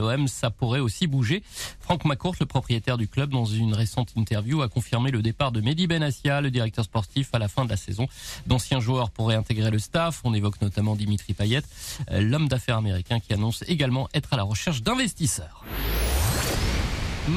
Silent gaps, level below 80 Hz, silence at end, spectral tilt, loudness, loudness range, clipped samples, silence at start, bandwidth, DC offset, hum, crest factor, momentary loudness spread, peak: none; -38 dBFS; 0 s; -5.5 dB/octave; -26 LUFS; 1 LU; under 0.1%; 0 s; 15 kHz; under 0.1%; none; 14 dB; 4 LU; -10 dBFS